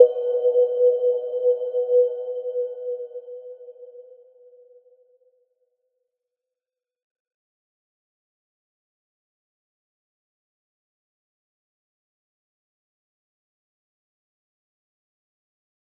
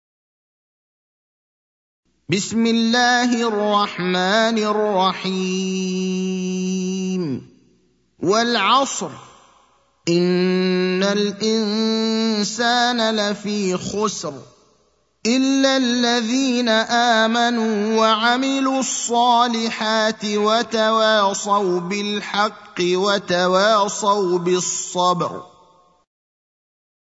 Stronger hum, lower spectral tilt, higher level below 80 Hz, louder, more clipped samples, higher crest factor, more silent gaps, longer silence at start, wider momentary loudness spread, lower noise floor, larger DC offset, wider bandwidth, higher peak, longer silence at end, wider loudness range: neither; second, -2.5 dB/octave vs -4 dB/octave; second, under -90 dBFS vs -66 dBFS; second, -22 LUFS vs -19 LUFS; neither; first, 26 dB vs 18 dB; neither; second, 0 s vs 2.3 s; first, 23 LU vs 7 LU; first, under -90 dBFS vs -62 dBFS; neither; second, 3.3 kHz vs 8 kHz; about the same, -2 dBFS vs -2 dBFS; first, 12 s vs 1.6 s; first, 22 LU vs 4 LU